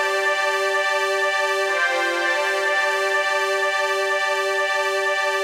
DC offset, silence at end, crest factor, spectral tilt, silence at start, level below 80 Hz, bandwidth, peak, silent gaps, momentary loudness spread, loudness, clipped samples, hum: under 0.1%; 0 s; 12 dB; 0.5 dB/octave; 0 s; -84 dBFS; 16 kHz; -10 dBFS; none; 1 LU; -20 LUFS; under 0.1%; none